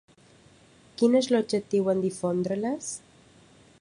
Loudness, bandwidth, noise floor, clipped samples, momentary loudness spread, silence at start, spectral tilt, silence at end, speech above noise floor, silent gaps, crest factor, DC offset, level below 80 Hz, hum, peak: -26 LUFS; 11.5 kHz; -57 dBFS; under 0.1%; 13 LU; 1 s; -5.5 dB/octave; 0.8 s; 31 dB; none; 18 dB; under 0.1%; -68 dBFS; none; -10 dBFS